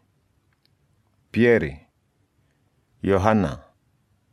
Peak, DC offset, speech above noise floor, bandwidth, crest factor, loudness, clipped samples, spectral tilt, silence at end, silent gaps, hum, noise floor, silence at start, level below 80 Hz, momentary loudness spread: -2 dBFS; under 0.1%; 48 dB; 11.5 kHz; 24 dB; -22 LUFS; under 0.1%; -7.5 dB/octave; 0.75 s; none; none; -67 dBFS; 1.35 s; -50 dBFS; 13 LU